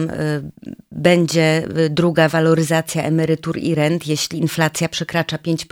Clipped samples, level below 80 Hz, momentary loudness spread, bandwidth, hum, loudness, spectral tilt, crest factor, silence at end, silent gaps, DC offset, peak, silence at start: under 0.1%; -52 dBFS; 8 LU; 16.5 kHz; none; -18 LUFS; -5.5 dB/octave; 18 dB; 0.1 s; none; under 0.1%; 0 dBFS; 0 s